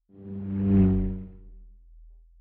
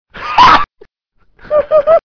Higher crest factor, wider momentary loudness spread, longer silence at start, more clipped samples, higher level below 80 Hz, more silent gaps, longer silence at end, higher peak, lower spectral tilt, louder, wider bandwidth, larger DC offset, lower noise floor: about the same, 16 dB vs 12 dB; first, 19 LU vs 9 LU; about the same, 0.2 s vs 0.15 s; neither; about the same, -38 dBFS vs -36 dBFS; neither; first, 0.35 s vs 0.15 s; second, -10 dBFS vs 0 dBFS; first, -12 dB/octave vs -4 dB/octave; second, -25 LUFS vs -10 LUFS; second, 3.1 kHz vs 5.4 kHz; neither; second, -51 dBFS vs -56 dBFS